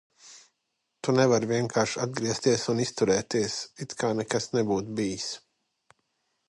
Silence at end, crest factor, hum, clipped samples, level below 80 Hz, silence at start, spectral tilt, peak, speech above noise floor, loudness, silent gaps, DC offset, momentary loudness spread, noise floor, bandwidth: 1.1 s; 20 dB; none; under 0.1%; -64 dBFS; 0.25 s; -4.5 dB/octave; -8 dBFS; 53 dB; -27 LUFS; none; under 0.1%; 11 LU; -80 dBFS; 11.5 kHz